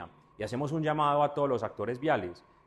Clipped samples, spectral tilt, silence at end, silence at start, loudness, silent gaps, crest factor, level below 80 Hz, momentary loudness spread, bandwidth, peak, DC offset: under 0.1%; -7 dB/octave; 0.3 s; 0 s; -30 LUFS; none; 18 dB; -64 dBFS; 13 LU; 12 kHz; -14 dBFS; under 0.1%